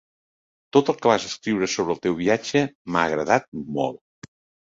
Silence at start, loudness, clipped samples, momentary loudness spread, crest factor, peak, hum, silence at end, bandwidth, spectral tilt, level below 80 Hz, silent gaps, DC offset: 0.75 s; -23 LUFS; under 0.1%; 7 LU; 22 dB; -2 dBFS; none; 0.75 s; 7.8 kHz; -4.5 dB/octave; -58 dBFS; 2.75-2.85 s, 3.48-3.52 s; under 0.1%